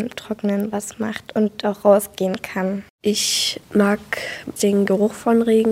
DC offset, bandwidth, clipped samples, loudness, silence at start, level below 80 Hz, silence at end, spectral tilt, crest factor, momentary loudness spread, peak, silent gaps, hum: under 0.1%; 16.5 kHz; under 0.1%; -20 LUFS; 0 s; -58 dBFS; 0 s; -4.5 dB/octave; 18 dB; 10 LU; -2 dBFS; 2.90-2.99 s; none